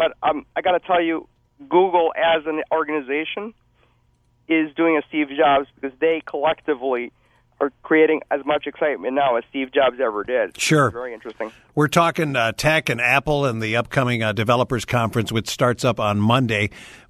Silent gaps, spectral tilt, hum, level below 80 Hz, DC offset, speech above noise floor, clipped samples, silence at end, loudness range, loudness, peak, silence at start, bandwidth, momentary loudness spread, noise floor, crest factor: none; -5.5 dB/octave; none; -50 dBFS; under 0.1%; 41 dB; under 0.1%; 0.15 s; 3 LU; -20 LUFS; -2 dBFS; 0 s; 14 kHz; 9 LU; -61 dBFS; 20 dB